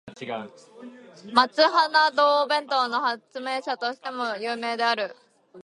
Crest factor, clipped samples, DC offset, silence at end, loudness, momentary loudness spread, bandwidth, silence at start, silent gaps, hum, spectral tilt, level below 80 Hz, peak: 22 dB; under 0.1%; under 0.1%; 0.05 s; -24 LUFS; 15 LU; 11.5 kHz; 0.05 s; none; none; -2.5 dB/octave; -76 dBFS; -2 dBFS